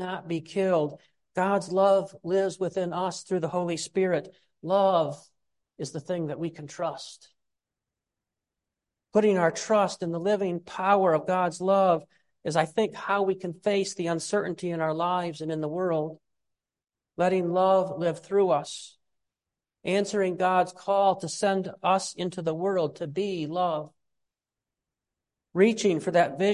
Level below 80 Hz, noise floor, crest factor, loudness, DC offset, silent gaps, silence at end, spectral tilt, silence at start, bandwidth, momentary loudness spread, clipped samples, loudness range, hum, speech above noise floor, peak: -74 dBFS; under -90 dBFS; 20 dB; -27 LUFS; under 0.1%; none; 0 s; -5.5 dB/octave; 0 s; 11.5 kHz; 11 LU; under 0.1%; 5 LU; none; over 64 dB; -8 dBFS